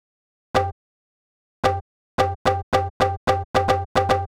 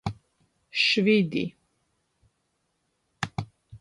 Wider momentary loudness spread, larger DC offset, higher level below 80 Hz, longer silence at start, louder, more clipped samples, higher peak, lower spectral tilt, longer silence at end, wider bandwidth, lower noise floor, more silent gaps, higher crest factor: second, 4 LU vs 16 LU; neither; first, -42 dBFS vs -56 dBFS; first, 0.55 s vs 0.05 s; about the same, -23 LUFS vs -25 LUFS; neither; first, -6 dBFS vs -10 dBFS; about the same, -5.5 dB/octave vs -5 dB/octave; about the same, 0.1 s vs 0.05 s; first, 16.5 kHz vs 11.5 kHz; first, under -90 dBFS vs -75 dBFS; first, 0.72-1.63 s, 1.81-2.18 s, 2.35-2.45 s, 2.63-2.72 s, 2.90-3.00 s, 3.17-3.27 s, 3.45-3.54 s, 3.85-3.95 s vs none; about the same, 16 dB vs 20 dB